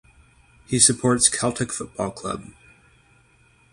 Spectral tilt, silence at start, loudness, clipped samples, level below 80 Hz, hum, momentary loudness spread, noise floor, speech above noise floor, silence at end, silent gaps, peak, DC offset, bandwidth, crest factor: -3 dB/octave; 0.7 s; -20 LUFS; under 0.1%; -52 dBFS; none; 15 LU; -58 dBFS; 36 dB; 1.2 s; none; -2 dBFS; under 0.1%; 11.5 kHz; 24 dB